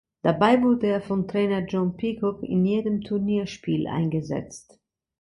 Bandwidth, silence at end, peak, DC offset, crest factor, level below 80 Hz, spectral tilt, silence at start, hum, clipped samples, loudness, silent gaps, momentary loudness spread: 11 kHz; 0.6 s; -6 dBFS; under 0.1%; 18 dB; -56 dBFS; -7.5 dB/octave; 0.25 s; none; under 0.1%; -24 LUFS; none; 9 LU